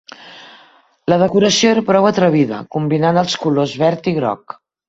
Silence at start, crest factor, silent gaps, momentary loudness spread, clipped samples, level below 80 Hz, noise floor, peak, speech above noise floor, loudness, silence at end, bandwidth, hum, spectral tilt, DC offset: 0.2 s; 16 dB; none; 10 LU; under 0.1%; -54 dBFS; -49 dBFS; 0 dBFS; 35 dB; -15 LUFS; 0.5 s; 8.2 kHz; none; -5 dB/octave; under 0.1%